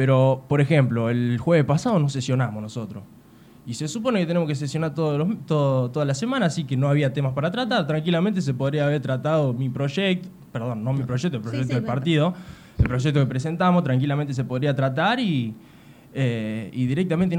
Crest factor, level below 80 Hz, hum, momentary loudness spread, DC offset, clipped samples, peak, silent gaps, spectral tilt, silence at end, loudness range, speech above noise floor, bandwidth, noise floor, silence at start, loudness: 16 dB; -46 dBFS; none; 9 LU; under 0.1%; under 0.1%; -6 dBFS; none; -7 dB/octave; 0 s; 2 LU; 27 dB; 10 kHz; -49 dBFS; 0 s; -23 LUFS